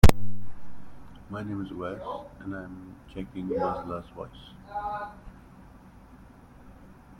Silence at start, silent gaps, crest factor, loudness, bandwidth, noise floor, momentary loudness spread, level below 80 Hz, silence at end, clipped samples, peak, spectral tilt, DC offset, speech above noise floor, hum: 0.05 s; none; 24 dB; -34 LUFS; 16.5 kHz; -51 dBFS; 22 LU; -36 dBFS; 1.9 s; under 0.1%; -2 dBFS; -6.5 dB/octave; under 0.1%; 16 dB; none